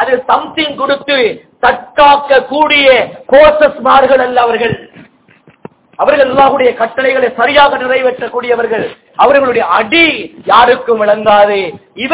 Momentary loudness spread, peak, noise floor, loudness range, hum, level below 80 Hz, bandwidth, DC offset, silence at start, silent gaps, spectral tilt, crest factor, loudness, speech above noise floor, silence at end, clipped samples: 9 LU; 0 dBFS; -45 dBFS; 3 LU; none; -42 dBFS; 4 kHz; under 0.1%; 0 s; none; -7.5 dB/octave; 10 dB; -9 LUFS; 36 dB; 0 s; 4%